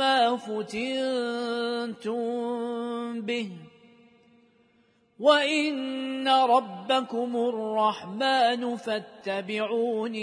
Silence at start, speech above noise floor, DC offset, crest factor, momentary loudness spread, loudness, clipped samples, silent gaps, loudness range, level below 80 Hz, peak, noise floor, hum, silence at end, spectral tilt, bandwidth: 0 s; 38 dB; under 0.1%; 20 dB; 10 LU; -27 LUFS; under 0.1%; none; 7 LU; -78 dBFS; -6 dBFS; -65 dBFS; none; 0 s; -4 dB/octave; 10.5 kHz